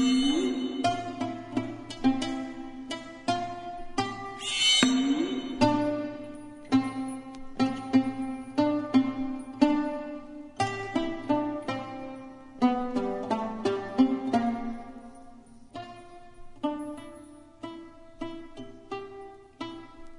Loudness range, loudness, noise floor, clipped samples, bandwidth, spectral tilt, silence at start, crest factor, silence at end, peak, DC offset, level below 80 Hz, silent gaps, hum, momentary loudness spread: 14 LU; -29 LUFS; -49 dBFS; under 0.1%; 11 kHz; -4 dB/octave; 0 s; 24 dB; 0 s; -4 dBFS; under 0.1%; -54 dBFS; none; none; 19 LU